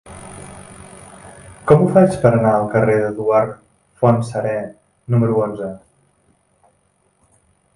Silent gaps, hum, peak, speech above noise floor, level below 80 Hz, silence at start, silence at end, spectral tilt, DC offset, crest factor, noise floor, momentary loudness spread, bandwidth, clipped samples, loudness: none; none; 0 dBFS; 46 dB; -50 dBFS; 0.05 s; 2 s; -8.5 dB/octave; under 0.1%; 18 dB; -61 dBFS; 25 LU; 11.5 kHz; under 0.1%; -16 LUFS